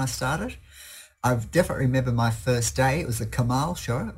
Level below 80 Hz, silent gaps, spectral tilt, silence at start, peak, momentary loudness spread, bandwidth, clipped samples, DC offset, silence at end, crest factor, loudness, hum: -42 dBFS; none; -5.5 dB/octave; 0 s; -8 dBFS; 15 LU; 16 kHz; under 0.1%; under 0.1%; 0 s; 16 dB; -25 LUFS; none